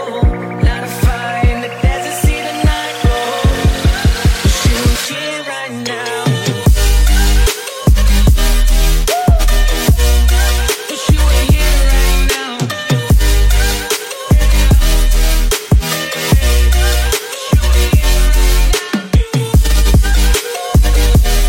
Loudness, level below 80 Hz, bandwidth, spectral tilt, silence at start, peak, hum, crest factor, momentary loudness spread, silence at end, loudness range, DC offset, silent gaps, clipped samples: -13 LUFS; -12 dBFS; 16.5 kHz; -4.5 dB/octave; 0 s; 0 dBFS; none; 10 dB; 5 LU; 0 s; 2 LU; under 0.1%; none; under 0.1%